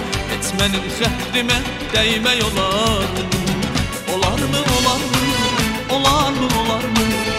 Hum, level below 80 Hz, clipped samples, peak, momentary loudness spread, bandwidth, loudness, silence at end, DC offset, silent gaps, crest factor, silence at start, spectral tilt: none; -32 dBFS; under 0.1%; -2 dBFS; 5 LU; 16 kHz; -17 LUFS; 0 s; under 0.1%; none; 16 dB; 0 s; -3.5 dB/octave